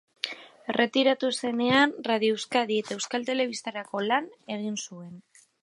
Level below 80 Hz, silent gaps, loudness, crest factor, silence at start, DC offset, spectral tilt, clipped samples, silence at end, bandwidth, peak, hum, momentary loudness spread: -76 dBFS; none; -27 LUFS; 22 dB; 0.25 s; under 0.1%; -3.5 dB/octave; under 0.1%; 0.45 s; 11.5 kHz; -6 dBFS; none; 13 LU